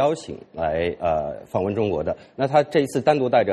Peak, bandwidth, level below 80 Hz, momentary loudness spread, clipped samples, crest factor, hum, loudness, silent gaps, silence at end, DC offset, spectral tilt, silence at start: -4 dBFS; 12.5 kHz; -52 dBFS; 9 LU; under 0.1%; 16 dB; none; -23 LUFS; none; 0 s; under 0.1%; -6.5 dB/octave; 0 s